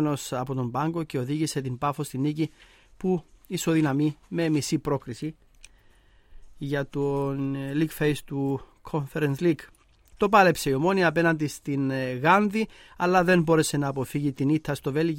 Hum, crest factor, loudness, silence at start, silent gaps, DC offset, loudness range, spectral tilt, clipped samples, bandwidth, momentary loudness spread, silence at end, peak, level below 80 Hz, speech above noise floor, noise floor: none; 20 dB; -26 LUFS; 0 s; none; under 0.1%; 7 LU; -6 dB/octave; under 0.1%; 16.5 kHz; 10 LU; 0 s; -6 dBFS; -54 dBFS; 32 dB; -57 dBFS